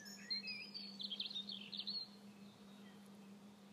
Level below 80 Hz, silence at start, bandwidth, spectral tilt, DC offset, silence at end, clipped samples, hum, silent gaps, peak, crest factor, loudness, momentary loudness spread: under -90 dBFS; 0 s; 15 kHz; -2.5 dB/octave; under 0.1%; 0 s; under 0.1%; none; none; -32 dBFS; 18 dB; -45 LUFS; 16 LU